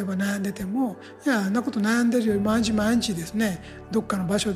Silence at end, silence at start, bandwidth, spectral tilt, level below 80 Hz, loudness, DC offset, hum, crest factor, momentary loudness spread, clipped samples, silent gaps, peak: 0 s; 0 s; 15.5 kHz; -5 dB/octave; -48 dBFS; -25 LUFS; under 0.1%; none; 14 dB; 7 LU; under 0.1%; none; -10 dBFS